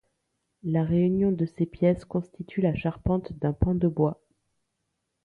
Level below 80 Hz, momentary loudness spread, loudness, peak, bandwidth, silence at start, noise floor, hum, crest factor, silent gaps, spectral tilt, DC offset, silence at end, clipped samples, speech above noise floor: -44 dBFS; 9 LU; -27 LUFS; -10 dBFS; 4.9 kHz; 0.65 s; -79 dBFS; none; 18 dB; none; -10.5 dB/octave; under 0.1%; 1.1 s; under 0.1%; 54 dB